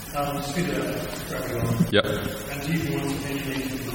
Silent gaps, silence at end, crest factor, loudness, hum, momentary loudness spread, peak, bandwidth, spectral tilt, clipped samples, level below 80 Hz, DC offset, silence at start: none; 0 s; 22 dB; -27 LUFS; none; 9 LU; -4 dBFS; 17 kHz; -5 dB/octave; under 0.1%; -44 dBFS; under 0.1%; 0 s